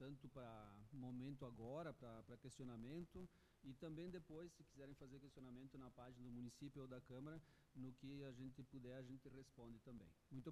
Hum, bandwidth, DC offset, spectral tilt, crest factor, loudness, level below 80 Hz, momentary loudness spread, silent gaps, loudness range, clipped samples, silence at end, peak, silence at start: none; 13 kHz; under 0.1%; -7 dB/octave; 16 dB; -59 LUFS; -74 dBFS; 9 LU; none; 3 LU; under 0.1%; 0 s; -42 dBFS; 0 s